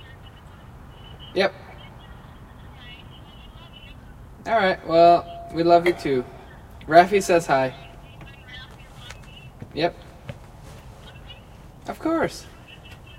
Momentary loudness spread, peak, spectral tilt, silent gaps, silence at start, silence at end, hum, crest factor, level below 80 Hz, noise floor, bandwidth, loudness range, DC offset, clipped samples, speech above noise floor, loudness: 27 LU; 0 dBFS; -5.5 dB/octave; none; 0.25 s; 0.25 s; none; 24 dB; -48 dBFS; -44 dBFS; 15.5 kHz; 15 LU; under 0.1%; under 0.1%; 25 dB; -20 LUFS